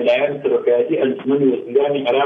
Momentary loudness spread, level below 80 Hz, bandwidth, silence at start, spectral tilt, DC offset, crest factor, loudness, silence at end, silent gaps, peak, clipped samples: 2 LU; -68 dBFS; 5.2 kHz; 0 s; -8 dB/octave; under 0.1%; 12 dB; -17 LUFS; 0 s; none; -4 dBFS; under 0.1%